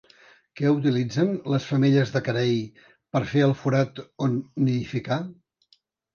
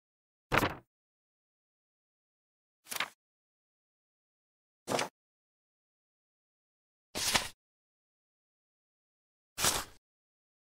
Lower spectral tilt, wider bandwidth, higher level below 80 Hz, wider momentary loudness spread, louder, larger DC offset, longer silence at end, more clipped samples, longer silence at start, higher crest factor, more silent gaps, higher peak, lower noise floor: first, -7.5 dB/octave vs -2 dB/octave; second, 7 kHz vs 16 kHz; about the same, -62 dBFS vs -60 dBFS; second, 8 LU vs 18 LU; first, -24 LUFS vs -33 LUFS; neither; about the same, 0.8 s vs 0.75 s; neither; about the same, 0.55 s vs 0.5 s; second, 16 dB vs 34 dB; second, none vs 0.87-2.83 s, 3.14-4.86 s, 5.10-7.14 s, 7.54-9.56 s; about the same, -8 dBFS vs -8 dBFS; second, -65 dBFS vs under -90 dBFS